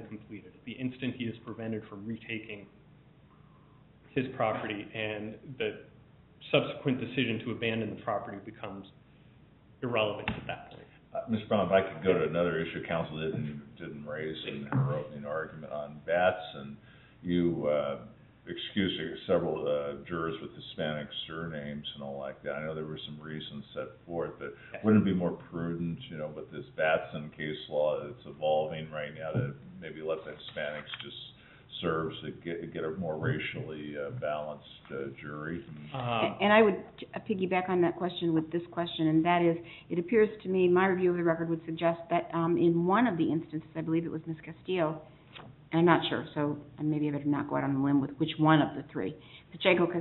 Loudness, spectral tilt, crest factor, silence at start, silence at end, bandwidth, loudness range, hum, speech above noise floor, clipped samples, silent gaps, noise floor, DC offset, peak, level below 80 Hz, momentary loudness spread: -32 LUFS; -5 dB/octave; 24 dB; 0 s; 0 s; 4.2 kHz; 9 LU; none; 27 dB; under 0.1%; none; -58 dBFS; under 0.1%; -8 dBFS; -64 dBFS; 16 LU